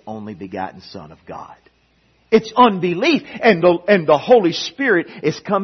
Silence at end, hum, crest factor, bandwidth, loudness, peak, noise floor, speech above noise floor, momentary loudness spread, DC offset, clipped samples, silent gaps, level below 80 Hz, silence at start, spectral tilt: 0 s; none; 18 dB; 6.4 kHz; -16 LUFS; 0 dBFS; -59 dBFS; 42 dB; 22 LU; under 0.1%; under 0.1%; none; -58 dBFS; 0.05 s; -5.5 dB/octave